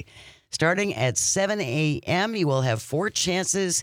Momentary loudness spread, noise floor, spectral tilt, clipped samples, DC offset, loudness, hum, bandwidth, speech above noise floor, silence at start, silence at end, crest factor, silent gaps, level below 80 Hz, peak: 4 LU; -47 dBFS; -3.5 dB/octave; under 0.1%; under 0.1%; -24 LUFS; none; 16.5 kHz; 23 dB; 0 s; 0 s; 16 dB; none; -60 dBFS; -8 dBFS